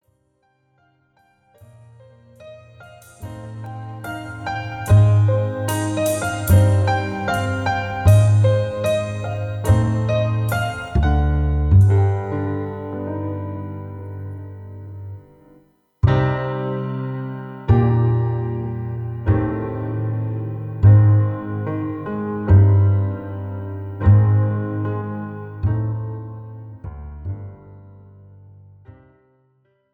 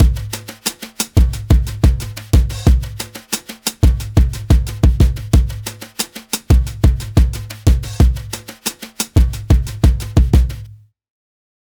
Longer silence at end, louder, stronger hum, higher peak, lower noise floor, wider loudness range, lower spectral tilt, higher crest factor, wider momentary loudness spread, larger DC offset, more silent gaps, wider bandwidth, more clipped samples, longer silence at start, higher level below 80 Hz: about the same, 1 s vs 0.95 s; about the same, -19 LUFS vs -17 LUFS; neither; about the same, -2 dBFS vs 0 dBFS; first, -64 dBFS vs -38 dBFS; first, 14 LU vs 1 LU; first, -7.5 dB/octave vs -5.5 dB/octave; about the same, 18 dB vs 14 dB; first, 19 LU vs 10 LU; neither; neither; second, 14.5 kHz vs over 20 kHz; neither; first, 2.4 s vs 0 s; second, -32 dBFS vs -16 dBFS